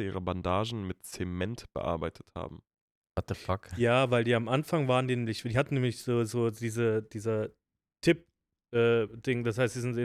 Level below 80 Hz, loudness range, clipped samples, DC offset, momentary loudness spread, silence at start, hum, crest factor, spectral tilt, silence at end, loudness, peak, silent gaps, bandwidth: -58 dBFS; 7 LU; under 0.1%; under 0.1%; 12 LU; 0 s; none; 20 dB; -6.5 dB/octave; 0 s; -31 LUFS; -12 dBFS; 2.81-3.02 s; 14.5 kHz